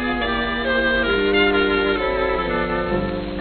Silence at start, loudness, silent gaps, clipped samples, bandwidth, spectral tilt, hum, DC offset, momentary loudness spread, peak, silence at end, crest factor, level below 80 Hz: 0 s; -19 LUFS; none; under 0.1%; 4.5 kHz; -9 dB/octave; none; under 0.1%; 5 LU; -4 dBFS; 0 s; 14 dB; -34 dBFS